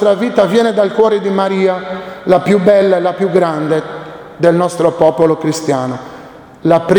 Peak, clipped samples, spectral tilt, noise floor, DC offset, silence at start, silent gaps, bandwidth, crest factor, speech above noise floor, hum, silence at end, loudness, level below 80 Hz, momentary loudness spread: 0 dBFS; under 0.1%; -6.5 dB/octave; -34 dBFS; under 0.1%; 0 s; none; over 20 kHz; 12 dB; 22 dB; none; 0 s; -13 LUFS; -52 dBFS; 12 LU